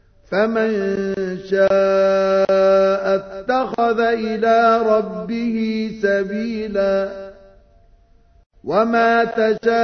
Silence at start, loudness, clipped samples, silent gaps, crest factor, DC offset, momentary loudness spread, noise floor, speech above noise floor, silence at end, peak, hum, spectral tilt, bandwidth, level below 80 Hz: 0.3 s; -18 LUFS; under 0.1%; 8.46-8.50 s; 14 dB; under 0.1%; 9 LU; -52 dBFS; 35 dB; 0 s; -4 dBFS; none; -6.5 dB/octave; 6.6 kHz; -52 dBFS